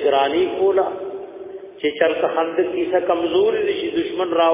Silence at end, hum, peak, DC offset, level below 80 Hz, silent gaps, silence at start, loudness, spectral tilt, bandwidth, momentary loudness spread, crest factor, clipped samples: 0 s; none; -2 dBFS; under 0.1%; -58 dBFS; none; 0 s; -20 LUFS; -8.5 dB/octave; 3.8 kHz; 13 LU; 18 dB; under 0.1%